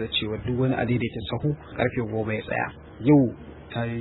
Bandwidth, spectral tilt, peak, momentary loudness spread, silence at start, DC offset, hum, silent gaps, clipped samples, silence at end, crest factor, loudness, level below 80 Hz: 4.1 kHz; -11 dB/octave; -6 dBFS; 11 LU; 0 s; under 0.1%; none; none; under 0.1%; 0 s; 18 dB; -26 LUFS; -48 dBFS